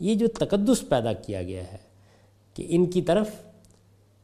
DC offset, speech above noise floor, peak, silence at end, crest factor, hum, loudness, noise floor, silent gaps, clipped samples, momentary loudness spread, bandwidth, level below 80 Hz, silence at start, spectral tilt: under 0.1%; 34 dB; -10 dBFS; 0.8 s; 18 dB; none; -25 LUFS; -59 dBFS; none; under 0.1%; 18 LU; 14.5 kHz; -52 dBFS; 0 s; -6 dB/octave